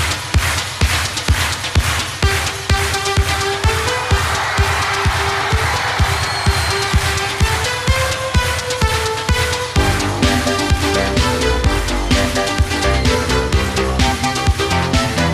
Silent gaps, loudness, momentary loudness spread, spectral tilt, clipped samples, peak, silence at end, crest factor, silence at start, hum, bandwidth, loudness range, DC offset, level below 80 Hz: none; -16 LUFS; 2 LU; -4 dB/octave; under 0.1%; -2 dBFS; 0 s; 14 dB; 0 s; none; 15.5 kHz; 1 LU; under 0.1%; -24 dBFS